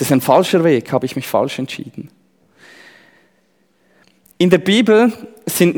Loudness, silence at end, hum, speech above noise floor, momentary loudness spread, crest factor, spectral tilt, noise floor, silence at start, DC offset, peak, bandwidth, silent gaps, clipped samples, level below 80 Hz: -15 LUFS; 0 s; none; 45 dB; 16 LU; 16 dB; -5.5 dB/octave; -60 dBFS; 0 s; under 0.1%; 0 dBFS; over 20 kHz; none; under 0.1%; -60 dBFS